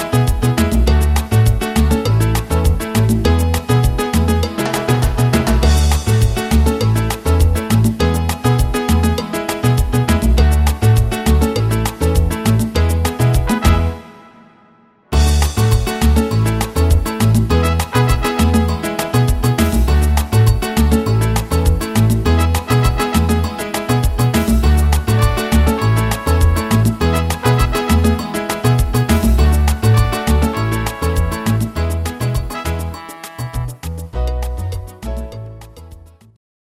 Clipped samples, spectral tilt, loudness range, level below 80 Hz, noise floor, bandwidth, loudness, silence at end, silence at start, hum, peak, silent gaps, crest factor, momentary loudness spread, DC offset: under 0.1%; -6 dB/octave; 4 LU; -18 dBFS; -50 dBFS; 16 kHz; -15 LUFS; 0.7 s; 0 s; none; 0 dBFS; none; 14 dB; 7 LU; under 0.1%